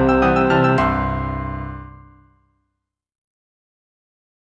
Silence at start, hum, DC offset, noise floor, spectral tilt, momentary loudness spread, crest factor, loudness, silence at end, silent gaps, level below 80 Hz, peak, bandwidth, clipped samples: 0 s; none; under 0.1%; -78 dBFS; -8 dB/octave; 16 LU; 18 dB; -18 LUFS; 2.55 s; none; -34 dBFS; -4 dBFS; 8.8 kHz; under 0.1%